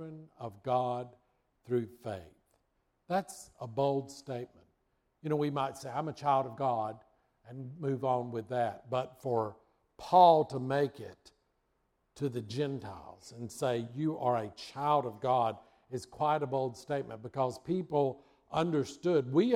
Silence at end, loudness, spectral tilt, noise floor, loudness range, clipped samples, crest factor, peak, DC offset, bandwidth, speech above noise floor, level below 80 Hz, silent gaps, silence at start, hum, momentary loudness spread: 0 s; -33 LUFS; -6.5 dB/octave; -77 dBFS; 8 LU; under 0.1%; 22 dB; -10 dBFS; under 0.1%; 15 kHz; 45 dB; -72 dBFS; none; 0 s; none; 16 LU